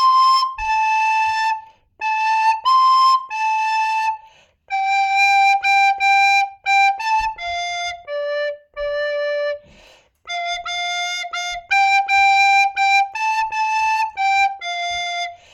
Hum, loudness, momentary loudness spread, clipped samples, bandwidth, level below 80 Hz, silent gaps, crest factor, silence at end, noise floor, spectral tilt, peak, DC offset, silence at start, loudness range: none; -17 LUFS; 12 LU; under 0.1%; 13.5 kHz; -52 dBFS; none; 12 dB; 0.2 s; -50 dBFS; 1.5 dB/octave; -6 dBFS; under 0.1%; 0 s; 8 LU